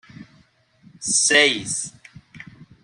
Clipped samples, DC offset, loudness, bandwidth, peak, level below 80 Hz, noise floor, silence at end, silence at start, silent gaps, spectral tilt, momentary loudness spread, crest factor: under 0.1%; under 0.1%; -18 LUFS; 13.5 kHz; -2 dBFS; -64 dBFS; -57 dBFS; 0.2 s; 0.2 s; none; -0.5 dB/octave; 16 LU; 22 dB